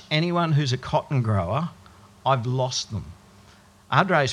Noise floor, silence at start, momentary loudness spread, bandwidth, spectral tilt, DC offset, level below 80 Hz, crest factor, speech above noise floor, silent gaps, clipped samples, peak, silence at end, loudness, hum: -52 dBFS; 0.1 s; 11 LU; 10.5 kHz; -5.5 dB/octave; under 0.1%; -54 dBFS; 22 dB; 29 dB; none; under 0.1%; -2 dBFS; 0 s; -24 LUFS; none